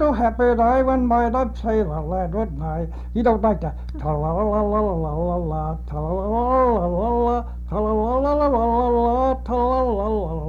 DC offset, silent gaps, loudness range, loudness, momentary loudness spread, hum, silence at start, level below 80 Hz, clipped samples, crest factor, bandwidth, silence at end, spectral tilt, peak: under 0.1%; none; 3 LU; -21 LUFS; 8 LU; 60 Hz at -30 dBFS; 0 s; -30 dBFS; under 0.1%; 12 dB; 6.8 kHz; 0 s; -9.5 dB/octave; -8 dBFS